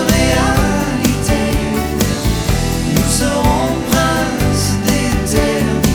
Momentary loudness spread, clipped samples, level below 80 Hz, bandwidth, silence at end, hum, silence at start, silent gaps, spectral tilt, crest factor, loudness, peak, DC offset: 3 LU; under 0.1%; -22 dBFS; over 20 kHz; 0 s; none; 0 s; none; -4.5 dB/octave; 12 dB; -15 LUFS; -2 dBFS; under 0.1%